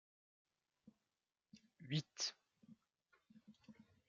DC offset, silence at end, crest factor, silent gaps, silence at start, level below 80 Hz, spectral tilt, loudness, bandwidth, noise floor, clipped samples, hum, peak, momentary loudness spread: under 0.1%; 0.25 s; 26 dB; none; 0.85 s; -90 dBFS; -4 dB/octave; -44 LUFS; 7.4 kHz; under -90 dBFS; under 0.1%; none; -28 dBFS; 24 LU